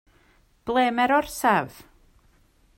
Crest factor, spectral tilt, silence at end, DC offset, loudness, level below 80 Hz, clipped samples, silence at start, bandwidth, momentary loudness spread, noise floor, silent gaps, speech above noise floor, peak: 18 dB; -4 dB/octave; 1.05 s; under 0.1%; -22 LUFS; -56 dBFS; under 0.1%; 0.65 s; 16.5 kHz; 14 LU; -60 dBFS; none; 38 dB; -8 dBFS